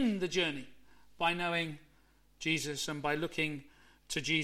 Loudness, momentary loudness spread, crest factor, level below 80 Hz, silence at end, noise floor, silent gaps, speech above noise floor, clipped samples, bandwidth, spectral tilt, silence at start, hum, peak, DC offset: -34 LUFS; 9 LU; 18 dB; -64 dBFS; 0 s; -65 dBFS; none; 31 dB; under 0.1%; 16.5 kHz; -3.5 dB/octave; 0 s; none; -18 dBFS; under 0.1%